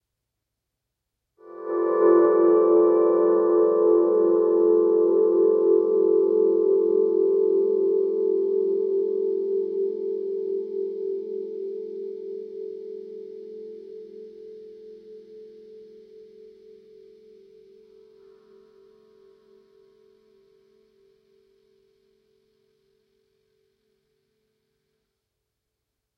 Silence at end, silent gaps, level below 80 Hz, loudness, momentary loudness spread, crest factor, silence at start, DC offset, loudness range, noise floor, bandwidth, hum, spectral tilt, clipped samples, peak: 10.35 s; none; -84 dBFS; -21 LUFS; 21 LU; 16 dB; 1.45 s; under 0.1%; 21 LU; -82 dBFS; 2.5 kHz; none; -10 dB/octave; under 0.1%; -8 dBFS